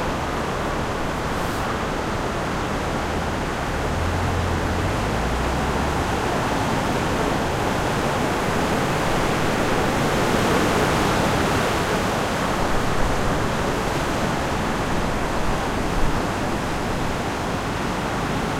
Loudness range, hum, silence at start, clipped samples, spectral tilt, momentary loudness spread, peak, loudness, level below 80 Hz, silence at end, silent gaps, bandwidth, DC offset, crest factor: 4 LU; none; 0 s; under 0.1%; -5 dB/octave; 5 LU; -6 dBFS; -23 LUFS; -32 dBFS; 0 s; none; 16.5 kHz; under 0.1%; 16 dB